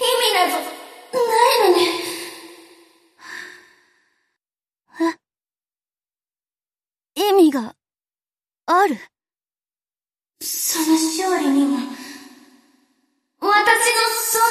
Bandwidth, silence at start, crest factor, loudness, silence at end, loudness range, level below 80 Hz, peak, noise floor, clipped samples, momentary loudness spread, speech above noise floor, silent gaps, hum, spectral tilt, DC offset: 15.5 kHz; 0 s; 22 dB; -18 LUFS; 0 s; 13 LU; -76 dBFS; 0 dBFS; under -90 dBFS; under 0.1%; 20 LU; over 73 dB; none; none; -1 dB/octave; under 0.1%